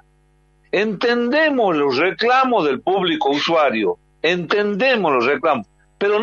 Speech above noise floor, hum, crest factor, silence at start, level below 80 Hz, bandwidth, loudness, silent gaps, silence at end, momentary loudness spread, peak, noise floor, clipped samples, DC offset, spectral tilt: 40 dB; none; 16 dB; 0.75 s; -60 dBFS; 7.2 kHz; -18 LUFS; none; 0 s; 6 LU; -2 dBFS; -57 dBFS; under 0.1%; under 0.1%; -5.5 dB/octave